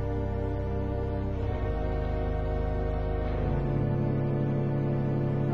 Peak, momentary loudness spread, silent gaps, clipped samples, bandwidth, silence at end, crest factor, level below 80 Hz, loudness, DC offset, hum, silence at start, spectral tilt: -18 dBFS; 3 LU; none; under 0.1%; 5.2 kHz; 0 s; 10 dB; -34 dBFS; -30 LUFS; 0.6%; none; 0 s; -10.5 dB/octave